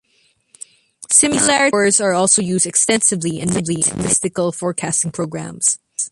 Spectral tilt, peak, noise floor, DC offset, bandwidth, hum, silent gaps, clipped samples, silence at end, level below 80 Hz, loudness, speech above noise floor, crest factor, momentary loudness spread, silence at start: -3 dB/octave; 0 dBFS; -60 dBFS; under 0.1%; 11.5 kHz; none; none; under 0.1%; 0.05 s; -52 dBFS; -15 LUFS; 43 dB; 18 dB; 8 LU; 1 s